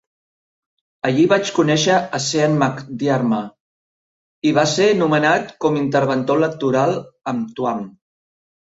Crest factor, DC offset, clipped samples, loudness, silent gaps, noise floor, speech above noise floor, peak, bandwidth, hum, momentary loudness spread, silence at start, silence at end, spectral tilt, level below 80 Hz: 16 dB; under 0.1%; under 0.1%; -18 LUFS; 3.60-4.42 s; under -90 dBFS; over 73 dB; -2 dBFS; 8 kHz; none; 10 LU; 1.05 s; 0.75 s; -5 dB/octave; -60 dBFS